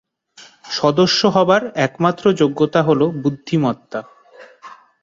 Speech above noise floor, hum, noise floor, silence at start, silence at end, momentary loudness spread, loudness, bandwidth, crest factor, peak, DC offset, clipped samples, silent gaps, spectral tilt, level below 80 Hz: 30 dB; none; -46 dBFS; 0.4 s; 0.3 s; 10 LU; -17 LUFS; 7.8 kHz; 16 dB; -2 dBFS; under 0.1%; under 0.1%; none; -5.5 dB/octave; -58 dBFS